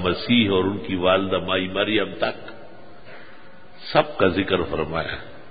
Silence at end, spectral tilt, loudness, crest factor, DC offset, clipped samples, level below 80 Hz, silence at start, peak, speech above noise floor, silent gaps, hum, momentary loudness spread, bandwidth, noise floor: 0 s; -10.5 dB/octave; -22 LUFS; 22 dB; 1%; under 0.1%; -46 dBFS; 0 s; -2 dBFS; 25 dB; none; none; 11 LU; 5 kHz; -47 dBFS